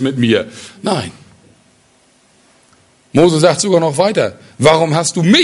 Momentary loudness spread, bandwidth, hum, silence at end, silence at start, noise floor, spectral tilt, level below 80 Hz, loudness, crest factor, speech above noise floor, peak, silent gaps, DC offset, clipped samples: 10 LU; 11.5 kHz; none; 0 s; 0 s; -52 dBFS; -4.5 dB/octave; -50 dBFS; -13 LUFS; 14 dB; 40 dB; 0 dBFS; none; under 0.1%; under 0.1%